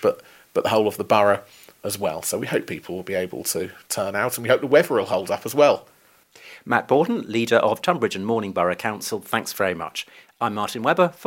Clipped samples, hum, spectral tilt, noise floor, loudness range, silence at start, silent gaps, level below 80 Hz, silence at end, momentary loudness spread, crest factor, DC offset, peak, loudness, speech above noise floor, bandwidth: under 0.1%; none; -4 dB/octave; -53 dBFS; 3 LU; 0 s; none; -66 dBFS; 0 s; 11 LU; 20 dB; under 0.1%; -2 dBFS; -22 LUFS; 31 dB; 17 kHz